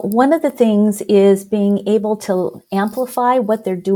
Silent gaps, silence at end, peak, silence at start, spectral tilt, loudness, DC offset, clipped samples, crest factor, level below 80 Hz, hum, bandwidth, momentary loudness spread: none; 0 s; 0 dBFS; 0 s; -6.5 dB/octave; -16 LUFS; under 0.1%; under 0.1%; 14 dB; -62 dBFS; none; 18.5 kHz; 7 LU